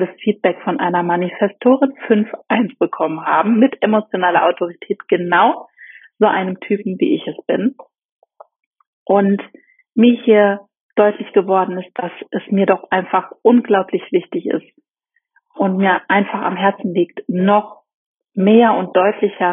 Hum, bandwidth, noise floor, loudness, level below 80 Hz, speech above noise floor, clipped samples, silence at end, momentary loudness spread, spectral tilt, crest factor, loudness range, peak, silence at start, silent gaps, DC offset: none; 3.8 kHz; -69 dBFS; -16 LUFS; -70 dBFS; 54 dB; under 0.1%; 0 s; 10 LU; -5 dB/octave; 16 dB; 3 LU; 0 dBFS; 0 s; 8.05-8.19 s, 8.66-8.71 s, 8.87-9.06 s, 10.81-10.89 s, 17.94-18.14 s; under 0.1%